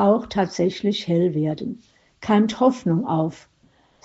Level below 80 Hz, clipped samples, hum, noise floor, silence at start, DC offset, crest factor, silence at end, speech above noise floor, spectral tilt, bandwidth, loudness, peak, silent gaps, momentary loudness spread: -58 dBFS; under 0.1%; none; -59 dBFS; 0 s; under 0.1%; 18 dB; 0.65 s; 38 dB; -6 dB/octave; 8 kHz; -22 LUFS; -4 dBFS; none; 11 LU